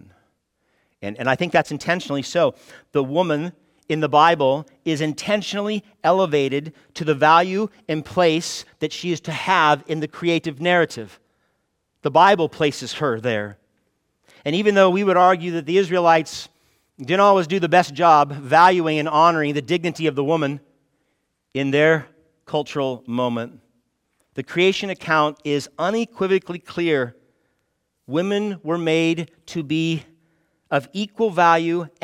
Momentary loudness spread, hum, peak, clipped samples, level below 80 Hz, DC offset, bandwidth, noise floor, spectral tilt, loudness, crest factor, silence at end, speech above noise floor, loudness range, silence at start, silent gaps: 13 LU; none; -2 dBFS; under 0.1%; -66 dBFS; under 0.1%; 15.5 kHz; -72 dBFS; -5.5 dB/octave; -20 LUFS; 18 dB; 0.15 s; 53 dB; 6 LU; 1 s; none